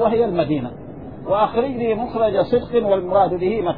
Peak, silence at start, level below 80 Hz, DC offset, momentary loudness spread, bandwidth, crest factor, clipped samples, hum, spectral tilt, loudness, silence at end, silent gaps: -4 dBFS; 0 s; -46 dBFS; 0.5%; 12 LU; 5 kHz; 14 dB; under 0.1%; none; -10.5 dB/octave; -19 LUFS; 0 s; none